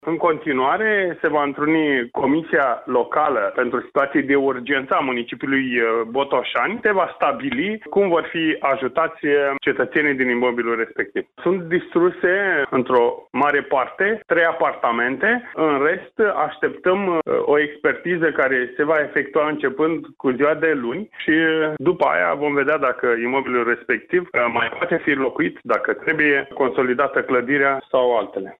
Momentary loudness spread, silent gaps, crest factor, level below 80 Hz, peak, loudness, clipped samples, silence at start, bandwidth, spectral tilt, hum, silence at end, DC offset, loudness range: 4 LU; none; 14 dB; -62 dBFS; -4 dBFS; -20 LUFS; under 0.1%; 0.05 s; 4.2 kHz; -8 dB/octave; none; 0.05 s; under 0.1%; 1 LU